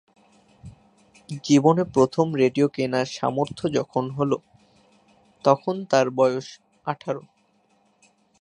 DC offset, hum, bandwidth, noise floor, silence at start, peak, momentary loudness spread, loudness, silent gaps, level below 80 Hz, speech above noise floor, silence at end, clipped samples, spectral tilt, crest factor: under 0.1%; none; 10.5 kHz; -64 dBFS; 0.65 s; -2 dBFS; 13 LU; -23 LUFS; none; -62 dBFS; 42 dB; 1.2 s; under 0.1%; -6 dB/octave; 22 dB